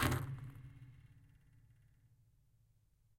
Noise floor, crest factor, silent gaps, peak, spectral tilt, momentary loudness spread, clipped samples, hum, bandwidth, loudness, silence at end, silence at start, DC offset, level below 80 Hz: -73 dBFS; 26 dB; none; -20 dBFS; -5 dB/octave; 25 LU; under 0.1%; none; 16.5 kHz; -44 LUFS; 1.9 s; 0 s; under 0.1%; -58 dBFS